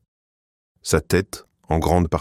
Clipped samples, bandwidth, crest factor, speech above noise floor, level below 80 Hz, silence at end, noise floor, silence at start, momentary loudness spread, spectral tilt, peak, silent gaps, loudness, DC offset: under 0.1%; 16 kHz; 20 dB; over 70 dB; -36 dBFS; 0 s; under -90 dBFS; 0.85 s; 14 LU; -5.5 dB/octave; -4 dBFS; none; -21 LUFS; under 0.1%